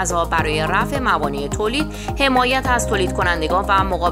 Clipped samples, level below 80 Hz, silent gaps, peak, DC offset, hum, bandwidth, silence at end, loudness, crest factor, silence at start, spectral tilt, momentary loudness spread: under 0.1%; -30 dBFS; none; -2 dBFS; under 0.1%; none; 16 kHz; 0 s; -18 LUFS; 16 dB; 0 s; -4 dB/octave; 5 LU